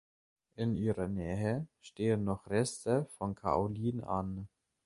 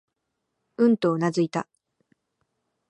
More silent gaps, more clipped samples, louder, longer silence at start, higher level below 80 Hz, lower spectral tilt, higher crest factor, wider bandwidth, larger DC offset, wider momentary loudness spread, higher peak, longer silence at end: neither; neither; second, -35 LUFS vs -24 LUFS; second, 0.6 s vs 0.8 s; first, -56 dBFS vs -76 dBFS; about the same, -7 dB/octave vs -7 dB/octave; about the same, 18 dB vs 18 dB; first, 11.5 kHz vs 9.6 kHz; neither; second, 7 LU vs 20 LU; second, -16 dBFS vs -10 dBFS; second, 0.4 s vs 1.3 s